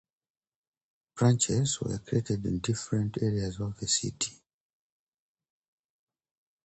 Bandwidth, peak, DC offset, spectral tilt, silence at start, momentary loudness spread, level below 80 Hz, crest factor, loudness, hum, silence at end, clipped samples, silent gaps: 9 kHz; -12 dBFS; under 0.1%; -4.5 dB/octave; 1.15 s; 9 LU; -54 dBFS; 20 dB; -29 LUFS; none; 2.3 s; under 0.1%; none